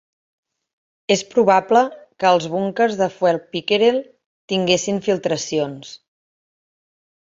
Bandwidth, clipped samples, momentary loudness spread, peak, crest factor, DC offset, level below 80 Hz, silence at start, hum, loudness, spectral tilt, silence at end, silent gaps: 7.8 kHz; under 0.1%; 9 LU; -2 dBFS; 18 dB; under 0.1%; -62 dBFS; 1.1 s; none; -19 LUFS; -4 dB/octave; 1.25 s; 4.26-4.48 s